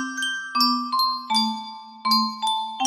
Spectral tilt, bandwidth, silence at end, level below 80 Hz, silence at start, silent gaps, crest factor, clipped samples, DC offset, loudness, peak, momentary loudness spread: -1 dB/octave; 15.5 kHz; 0 s; -78 dBFS; 0 s; none; 16 dB; under 0.1%; under 0.1%; -22 LUFS; -8 dBFS; 8 LU